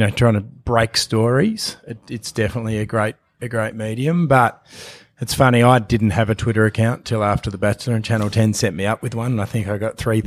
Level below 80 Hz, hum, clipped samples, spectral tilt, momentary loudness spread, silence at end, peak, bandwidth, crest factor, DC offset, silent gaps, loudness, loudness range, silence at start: -42 dBFS; none; under 0.1%; -6 dB/octave; 11 LU; 0 s; 0 dBFS; 15 kHz; 18 dB; under 0.1%; none; -19 LUFS; 4 LU; 0 s